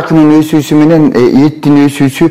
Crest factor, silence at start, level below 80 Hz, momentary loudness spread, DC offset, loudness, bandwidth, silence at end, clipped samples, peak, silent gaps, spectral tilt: 6 dB; 0 s; -40 dBFS; 3 LU; 2%; -7 LUFS; 15.5 kHz; 0 s; 0.2%; 0 dBFS; none; -7 dB/octave